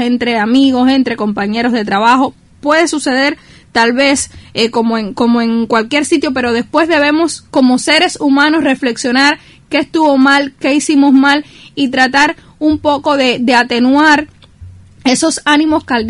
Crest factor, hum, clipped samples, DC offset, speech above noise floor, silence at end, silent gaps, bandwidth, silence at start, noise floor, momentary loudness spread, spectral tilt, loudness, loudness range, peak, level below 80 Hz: 12 dB; none; under 0.1%; under 0.1%; 24 dB; 0 s; none; 11.5 kHz; 0 s; -35 dBFS; 7 LU; -3 dB/octave; -11 LUFS; 2 LU; 0 dBFS; -46 dBFS